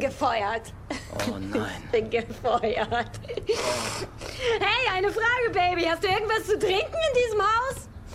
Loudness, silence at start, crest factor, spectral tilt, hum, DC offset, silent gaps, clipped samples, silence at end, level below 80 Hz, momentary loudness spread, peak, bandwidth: -26 LUFS; 0 s; 18 dB; -3.5 dB/octave; none; under 0.1%; none; under 0.1%; 0 s; -46 dBFS; 11 LU; -8 dBFS; 16 kHz